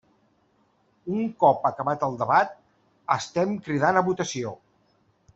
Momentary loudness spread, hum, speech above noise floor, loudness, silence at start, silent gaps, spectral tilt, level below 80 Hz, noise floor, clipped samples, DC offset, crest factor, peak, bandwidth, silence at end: 11 LU; none; 42 dB; -25 LUFS; 1.05 s; none; -5.5 dB/octave; -66 dBFS; -66 dBFS; under 0.1%; under 0.1%; 20 dB; -6 dBFS; 8.2 kHz; 0.8 s